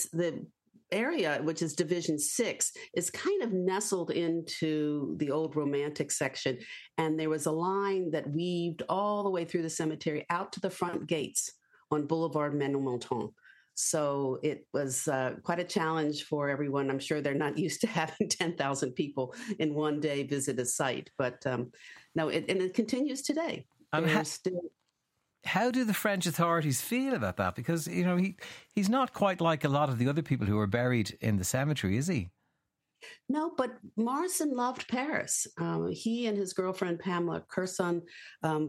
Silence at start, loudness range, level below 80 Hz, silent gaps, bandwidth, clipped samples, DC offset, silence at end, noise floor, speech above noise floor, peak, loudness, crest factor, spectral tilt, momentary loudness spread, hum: 0 s; 3 LU; -70 dBFS; none; 16 kHz; under 0.1%; under 0.1%; 0 s; -82 dBFS; 51 dB; -14 dBFS; -32 LUFS; 16 dB; -4.5 dB/octave; 6 LU; none